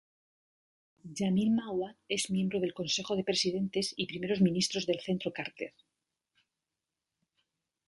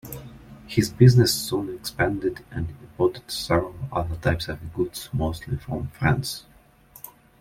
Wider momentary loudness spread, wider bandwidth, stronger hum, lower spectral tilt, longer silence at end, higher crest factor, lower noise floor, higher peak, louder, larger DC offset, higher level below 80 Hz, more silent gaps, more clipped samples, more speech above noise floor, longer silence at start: second, 9 LU vs 20 LU; second, 11.5 kHz vs 16.5 kHz; neither; about the same, -4.5 dB/octave vs -5.5 dB/octave; first, 2.2 s vs 0.3 s; about the same, 18 dB vs 22 dB; first, -89 dBFS vs -52 dBFS; second, -16 dBFS vs -2 dBFS; second, -32 LUFS vs -24 LUFS; neither; second, -70 dBFS vs -44 dBFS; neither; neither; first, 57 dB vs 29 dB; first, 1.05 s vs 0.05 s